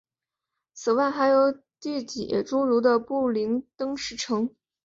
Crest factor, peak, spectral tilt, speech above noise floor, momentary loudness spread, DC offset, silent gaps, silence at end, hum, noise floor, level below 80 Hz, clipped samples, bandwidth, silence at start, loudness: 16 dB; -8 dBFS; -4.5 dB/octave; 64 dB; 11 LU; under 0.1%; none; 0.35 s; none; -88 dBFS; -66 dBFS; under 0.1%; 7.8 kHz; 0.75 s; -25 LUFS